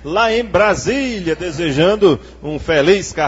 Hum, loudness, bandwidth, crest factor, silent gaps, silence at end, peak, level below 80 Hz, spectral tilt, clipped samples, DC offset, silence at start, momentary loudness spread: none; -15 LUFS; 8 kHz; 14 dB; none; 0 s; 0 dBFS; -38 dBFS; -5 dB/octave; under 0.1%; under 0.1%; 0 s; 8 LU